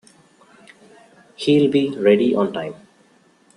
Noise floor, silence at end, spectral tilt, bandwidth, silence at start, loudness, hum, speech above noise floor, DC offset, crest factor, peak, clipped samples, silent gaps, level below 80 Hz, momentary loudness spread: -56 dBFS; 0.8 s; -7 dB/octave; 10.5 kHz; 1.4 s; -18 LUFS; none; 38 dB; under 0.1%; 18 dB; -2 dBFS; under 0.1%; none; -64 dBFS; 12 LU